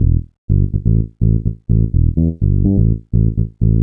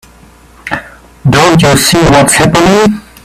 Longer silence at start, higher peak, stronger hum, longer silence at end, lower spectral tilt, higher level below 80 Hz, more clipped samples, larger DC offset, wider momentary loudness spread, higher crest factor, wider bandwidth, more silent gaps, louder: second, 0 s vs 0.65 s; about the same, 0 dBFS vs 0 dBFS; neither; second, 0 s vs 0.25 s; first, -16.5 dB/octave vs -4.5 dB/octave; first, -20 dBFS vs -30 dBFS; second, under 0.1% vs 0.3%; neither; second, 4 LU vs 14 LU; about the same, 12 dB vs 8 dB; second, 0.8 kHz vs 16 kHz; first, 0.38-0.48 s vs none; second, -16 LUFS vs -6 LUFS